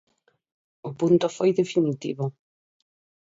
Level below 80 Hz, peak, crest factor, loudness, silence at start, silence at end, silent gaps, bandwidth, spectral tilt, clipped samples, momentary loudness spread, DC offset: -70 dBFS; -8 dBFS; 18 dB; -24 LUFS; 0.85 s; 0.95 s; none; 7.8 kHz; -7 dB/octave; under 0.1%; 13 LU; under 0.1%